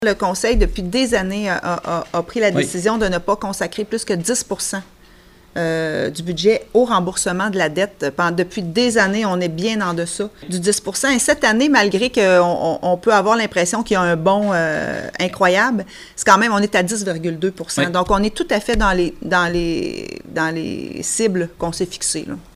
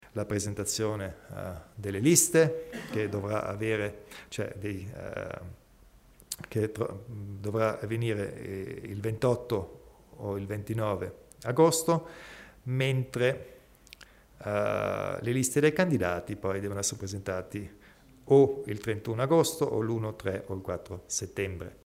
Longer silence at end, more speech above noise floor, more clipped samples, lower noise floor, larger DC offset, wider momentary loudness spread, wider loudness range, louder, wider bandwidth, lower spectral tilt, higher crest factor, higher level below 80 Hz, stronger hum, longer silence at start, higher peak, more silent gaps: about the same, 0.1 s vs 0.1 s; about the same, 29 dB vs 28 dB; neither; second, -46 dBFS vs -58 dBFS; neither; second, 9 LU vs 17 LU; about the same, 5 LU vs 7 LU; first, -18 LUFS vs -30 LUFS; about the same, 16 kHz vs 16 kHz; about the same, -4 dB/octave vs -5 dB/octave; second, 18 dB vs 24 dB; first, -34 dBFS vs -60 dBFS; neither; second, 0 s vs 0.15 s; first, 0 dBFS vs -6 dBFS; neither